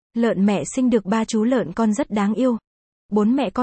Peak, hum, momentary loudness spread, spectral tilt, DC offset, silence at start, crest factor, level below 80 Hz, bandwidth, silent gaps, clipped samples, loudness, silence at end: -6 dBFS; none; 3 LU; -6 dB/octave; under 0.1%; 0.15 s; 14 dB; -54 dBFS; 8.8 kHz; 2.67-3.09 s; under 0.1%; -20 LUFS; 0 s